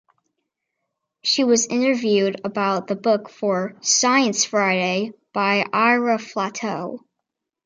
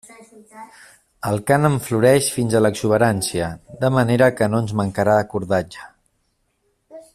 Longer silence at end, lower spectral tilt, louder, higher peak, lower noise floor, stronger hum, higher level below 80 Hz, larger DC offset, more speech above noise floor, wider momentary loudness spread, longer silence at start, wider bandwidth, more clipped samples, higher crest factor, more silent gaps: first, 0.65 s vs 0.15 s; second, -3 dB/octave vs -5.5 dB/octave; about the same, -20 LUFS vs -19 LUFS; about the same, -4 dBFS vs -2 dBFS; first, -82 dBFS vs -68 dBFS; neither; second, -72 dBFS vs -52 dBFS; neither; first, 61 dB vs 49 dB; about the same, 9 LU vs 9 LU; first, 1.25 s vs 0.55 s; second, 10 kHz vs 15 kHz; neither; about the same, 18 dB vs 18 dB; neither